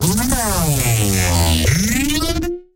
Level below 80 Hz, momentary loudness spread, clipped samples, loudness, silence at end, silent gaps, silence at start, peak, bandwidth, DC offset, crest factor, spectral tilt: -26 dBFS; 4 LU; under 0.1%; -16 LUFS; 0.15 s; none; 0 s; -2 dBFS; 16.5 kHz; under 0.1%; 16 dB; -4 dB/octave